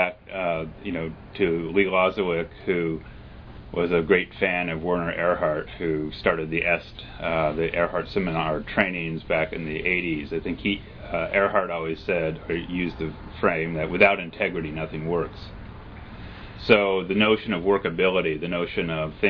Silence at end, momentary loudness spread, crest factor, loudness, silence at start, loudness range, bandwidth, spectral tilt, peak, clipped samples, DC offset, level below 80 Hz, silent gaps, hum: 0 s; 13 LU; 22 dB; -24 LUFS; 0 s; 2 LU; 5.4 kHz; -8.5 dB/octave; -2 dBFS; under 0.1%; under 0.1%; -46 dBFS; none; none